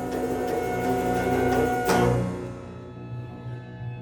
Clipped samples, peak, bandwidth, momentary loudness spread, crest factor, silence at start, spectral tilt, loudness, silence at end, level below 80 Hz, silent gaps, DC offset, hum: under 0.1%; -10 dBFS; over 20 kHz; 16 LU; 16 dB; 0 s; -6 dB/octave; -25 LUFS; 0 s; -44 dBFS; none; under 0.1%; 60 Hz at -40 dBFS